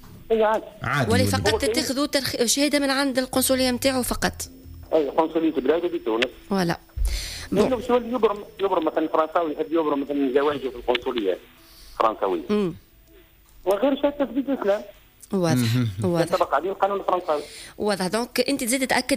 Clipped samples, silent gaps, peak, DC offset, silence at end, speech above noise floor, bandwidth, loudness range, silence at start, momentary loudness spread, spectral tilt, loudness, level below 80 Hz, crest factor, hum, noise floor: under 0.1%; none; -8 dBFS; under 0.1%; 0 s; 30 dB; 16 kHz; 4 LU; 0 s; 7 LU; -4.5 dB/octave; -23 LUFS; -42 dBFS; 16 dB; none; -52 dBFS